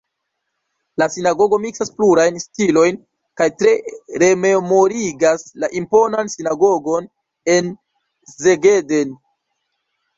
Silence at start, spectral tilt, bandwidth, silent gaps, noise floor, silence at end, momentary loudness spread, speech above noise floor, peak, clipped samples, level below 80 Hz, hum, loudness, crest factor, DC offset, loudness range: 1 s; -4.5 dB/octave; 7.8 kHz; none; -75 dBFS; 1 s; 9 LU; 60 dB; -2 dBFS; under 0.1%; -58 dBFS; none; -16 LUFS; 16 dB; under 0.1%; 2 LU